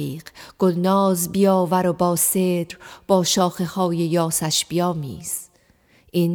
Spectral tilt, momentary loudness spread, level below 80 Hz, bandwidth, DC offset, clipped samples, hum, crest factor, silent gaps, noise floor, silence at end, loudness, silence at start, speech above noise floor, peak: -4.5 dB/octave; 11 LU; -58 dBFS; 19.5 kHz; under 0.1%; under 0.1%; none; 16 dB; none; -57 dBFS; 0 s; -20 LUFS; 0 s; 37 dB; -6 dBFS